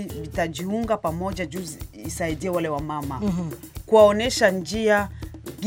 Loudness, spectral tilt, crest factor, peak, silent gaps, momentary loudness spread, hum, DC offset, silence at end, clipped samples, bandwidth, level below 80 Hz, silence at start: -23 LUFS; -5 dB/octave; 20 dB; -4 dBFS; none; 17 LU; none; under 0.1%; 0 s; under 0.1%; 17 kHz; -42 dBFS; 0 s